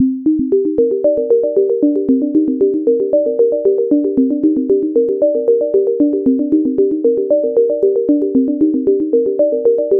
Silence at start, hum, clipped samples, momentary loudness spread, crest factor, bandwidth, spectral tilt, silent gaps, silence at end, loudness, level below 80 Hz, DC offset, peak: 0 s; none; under 0.1%; 2 LU; 10 dB; 1.5 kHz; -13 dB/octave; none; 0 s; -14 LUFS; -54 dBFS; under 0.1%; -2 dBFS